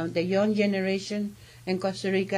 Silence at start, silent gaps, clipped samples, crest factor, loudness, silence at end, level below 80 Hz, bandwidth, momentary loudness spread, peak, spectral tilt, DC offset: 0 s; none; under 0.1%; 16 dB; -27 LUFS; 0 s; -64 dBFS; 12 kHz; 9 LU; -12 dBFS; -6 dB/octave; under 0.1%